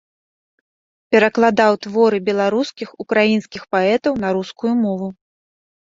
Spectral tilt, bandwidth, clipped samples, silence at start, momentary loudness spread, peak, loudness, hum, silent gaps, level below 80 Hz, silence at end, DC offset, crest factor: -6 dB/octave; 7.6 kHz; under 0.1%; 1.1 s; 8 LU; -2 dBFS; -17 LUFS; none; none; -58 dBFS; 0.8 s; under 0.1%; 18 dB